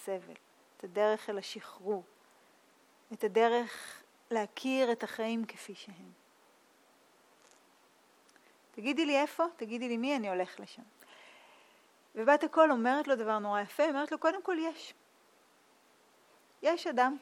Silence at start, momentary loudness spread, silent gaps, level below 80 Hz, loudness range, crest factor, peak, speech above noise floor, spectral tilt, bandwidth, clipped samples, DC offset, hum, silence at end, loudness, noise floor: 0 s; 20 LU; none; under -90 dBFS; 8 LU; 22 dB; -12 dBFS; 33 dB; -4 dB/octave; 16.5 kHz; under 0.1%; under 0.1%; none; 0.05 s; -32 LUFS; -66 dBFS